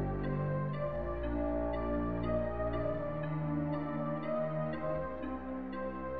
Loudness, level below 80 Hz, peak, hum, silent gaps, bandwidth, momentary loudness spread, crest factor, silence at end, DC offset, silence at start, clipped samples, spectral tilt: -36 LUFS; -46 dBFS; -22 dBFS; none; none; 4.8 kHz; 5 LU; 14 dB; 0 s; 0.4%; 0 s; under 0.1%; -11 dB/octave